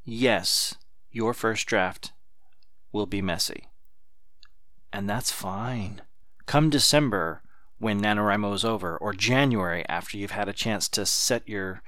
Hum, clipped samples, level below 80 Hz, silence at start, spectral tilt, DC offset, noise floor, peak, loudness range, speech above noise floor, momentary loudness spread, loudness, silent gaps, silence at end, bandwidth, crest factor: none; under 0.1%; -50 dBFS; 0.05 s; -3.5 dB/octave; 1%; -67 dBFS; -6 dBFS; 8 LU; 41 dB; 13 LU; -26 LUFS; none; 0.1 s; 18 kHz; 22 dB